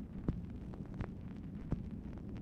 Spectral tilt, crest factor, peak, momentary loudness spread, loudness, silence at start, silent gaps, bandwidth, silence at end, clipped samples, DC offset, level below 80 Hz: -9.5 dB/octave; 22 dB; -22 dBFS; 5 LU; -45 LUFS; 0 s; none; 8.4 kHz; 0 s; under 0.1%; under 0.1%; -50 dBFS